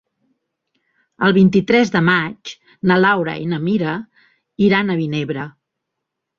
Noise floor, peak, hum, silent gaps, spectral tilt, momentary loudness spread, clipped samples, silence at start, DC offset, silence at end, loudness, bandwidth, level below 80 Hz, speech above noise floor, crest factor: -79 dBFS; -2 dBFS; none; none; -7 dB/octave; 14 LU; under 0.1%; 1.2 s; under 0.1%; 0.9 s; -17 LUFS; 7.2 kHz; -56 dBFS; 63 dB; 16 dB